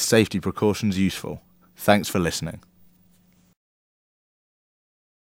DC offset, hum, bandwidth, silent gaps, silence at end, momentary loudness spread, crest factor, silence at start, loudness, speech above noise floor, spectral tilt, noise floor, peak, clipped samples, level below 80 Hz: under 0.1%; none; 16.5 kHz; none; 2.7 s; 16 LU; 26 dB; 0 s; -23 LUFS; 37 dB; -4.5 dB/octave; -59 dBFS; 0 dBFS; under 0.1%; -54 dBFS